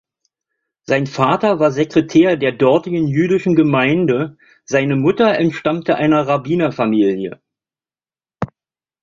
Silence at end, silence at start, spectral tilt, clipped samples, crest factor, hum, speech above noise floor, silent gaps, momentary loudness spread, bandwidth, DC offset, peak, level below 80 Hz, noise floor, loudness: 0.55 s; 0.9 s; -7 dB/octave; under 0.1%; 14 dB; none; over 75 dB; none; 7 LU; 7.4 kHz; under 0.1%; -2 dBFS; -54 dBFS; under -90 dBFS; -15 LUFS